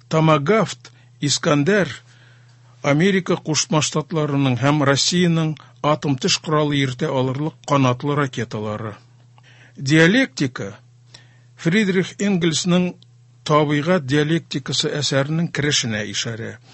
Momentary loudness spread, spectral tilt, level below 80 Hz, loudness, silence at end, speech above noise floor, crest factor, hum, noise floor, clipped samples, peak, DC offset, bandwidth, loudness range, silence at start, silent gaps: 10 LU; -4.5 dB/octave; -56 dBFS; -19 LUFS; 0.15 s; 30 dB; 20 dB; none; -49 dBFS; under 0.1%; 0 dBFS; under 0.1%; 8.6 kHz; 3 LU; 0.1 s; none